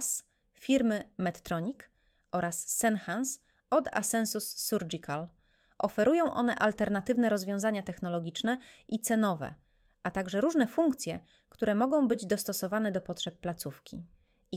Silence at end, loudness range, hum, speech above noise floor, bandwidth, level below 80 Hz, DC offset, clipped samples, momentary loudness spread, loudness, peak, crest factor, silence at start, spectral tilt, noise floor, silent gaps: 0 s; 2 LU; none; 19 dB; 17 kHz; -64 dBFS; under 0.1%; under 0.1%; 11 LU; -31 LUFS; -14 dBFS; 18 dB; 0 s; -4.5 dB/octave; -50 dBFS; none